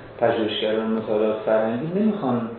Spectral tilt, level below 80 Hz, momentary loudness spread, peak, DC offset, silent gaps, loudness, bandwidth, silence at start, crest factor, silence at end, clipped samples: -10 dB/octave; -58 dBFS; 3 LU; -6 dBFS; under 0.1%; none; -23 LUFS; 4.4 kHz; 0 s; 16 dB; 0 s; under 0.1%